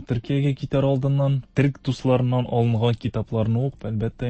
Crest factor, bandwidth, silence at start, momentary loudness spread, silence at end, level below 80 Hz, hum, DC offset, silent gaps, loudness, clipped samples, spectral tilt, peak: 16 dB; 8.4 kHz; 0 s; 5 LU; 0 s; -46 dBFS; none; under 0.1%; none; -23 LUFS; under 0.1%; -8.5 dB/octave; -6 dBFS